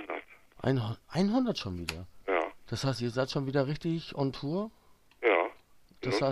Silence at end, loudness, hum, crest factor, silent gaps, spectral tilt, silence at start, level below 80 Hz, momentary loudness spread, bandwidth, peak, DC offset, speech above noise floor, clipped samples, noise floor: 0 s; -32 LUFS; none; 20 dB; none; -6.5 dB/octave; 0 s; -58 dBFS; 10 LU; 13 kHz; -12 dBFS; under 0.1%; 27 dB; under 0.1%; -58 dBFS